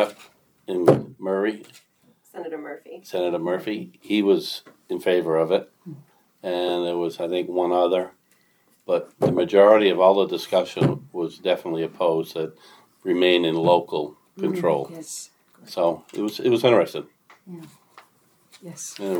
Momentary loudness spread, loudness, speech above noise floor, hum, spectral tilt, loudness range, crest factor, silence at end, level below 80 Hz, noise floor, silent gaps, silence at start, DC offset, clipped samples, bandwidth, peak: 18 LU; -22 LUFS; 40 dB; none; -5.5 dB/octave; 6 LU; 22 dB; 0 s; -70 dBFS; -63 dBFS; none; 0 s; under 0.1%; under 0.1%; 19.5 kHz; -2 dBFS